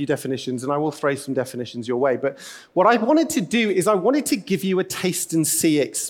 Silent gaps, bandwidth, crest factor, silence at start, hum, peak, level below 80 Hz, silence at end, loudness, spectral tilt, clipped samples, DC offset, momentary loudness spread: none; 18.5 kHz; 16 dB; 0 s; none; -4 dBFS; -66 dBFS; 0 s; -21 LUFS; -4 dB/octave; under 0.1%; under 0.1%; 9 LU